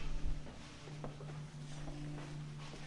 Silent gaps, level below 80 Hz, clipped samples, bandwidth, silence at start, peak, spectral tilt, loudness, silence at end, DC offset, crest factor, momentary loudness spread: none; -46 dBFS; under 0.1%; 11 kHz; 0 s; -26 dBFS; -6 dB/octave; -48 LUFS; 0 s; under 0.1%; 16 dB; 4 LU